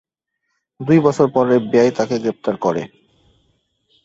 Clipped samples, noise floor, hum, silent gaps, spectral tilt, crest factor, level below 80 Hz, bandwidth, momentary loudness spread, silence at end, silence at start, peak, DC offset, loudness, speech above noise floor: under 0.1%; -75 dBFS; none; none; -7 dB/octave; 18 dB; -58 dBFS; 8 kHz; 11 LU; 1.2 s; 0.8 s; 0 dBFS; under 0.1%; -17 LUFS; 59 dB